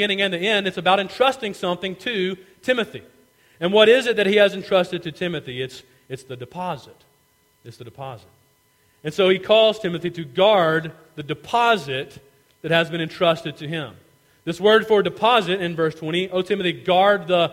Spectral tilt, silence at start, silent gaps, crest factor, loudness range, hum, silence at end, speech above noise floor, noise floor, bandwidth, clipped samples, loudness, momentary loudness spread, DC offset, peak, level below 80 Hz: -5 dB/octave; 0 s; none; 20 dB; 10 LU; none; 0 s; 41 dB; -61 dBFS; 16 kHz; under 0.1%; -20 LUFS; 19 LU; under 0.1%; -2 dBFS; -62 dBFS